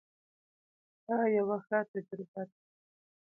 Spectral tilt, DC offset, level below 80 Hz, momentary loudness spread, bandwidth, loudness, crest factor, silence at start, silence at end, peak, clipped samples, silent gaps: -11 dB/octave; under 0.1%; -84 dBFS; 15 LU; 2.9 kHz; -34 LUFS; 18 dB; 1.1 s; 0.8 s; -18 dBFS; under 0.1%; 1.88-1.94 s, 2.28-2.34 s